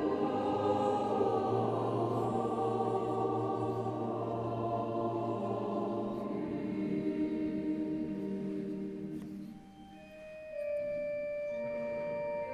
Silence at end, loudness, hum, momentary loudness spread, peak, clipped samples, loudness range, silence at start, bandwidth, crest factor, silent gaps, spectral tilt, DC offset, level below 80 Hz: 0 s; -35 LUFS; none; 11 LU; -18 dBFS; under 0.1%; 8 LU; 0 s; 12 kHz; 16 dB; none; -8.5 dB/octave; under 0.1%; -64 dBFS